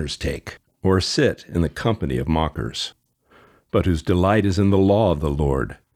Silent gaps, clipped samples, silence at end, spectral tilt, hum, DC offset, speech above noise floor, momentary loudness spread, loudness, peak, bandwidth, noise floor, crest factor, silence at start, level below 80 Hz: none; under 0.1%; 0.2 s; -6.5 dB/octave; none; under 0.1%; 35 dB; 10 LU; -21 LUFS; -4 dBFS; 14 kHz; -55 dBFS; 16 dB; 0 s; -34 dBFS